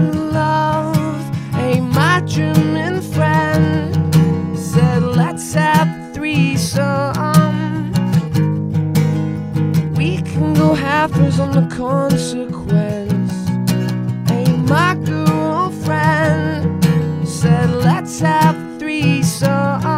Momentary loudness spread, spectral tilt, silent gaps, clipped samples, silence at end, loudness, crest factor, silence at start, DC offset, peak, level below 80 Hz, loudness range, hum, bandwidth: 6 LU; -6.5 dB/octave; none; under 0.1%; 0 s; -16 LUFS; 16 dB; 0 s; 0.1%; 0 dBFS; -44 dBFS; 2 LU; none; 16 kHz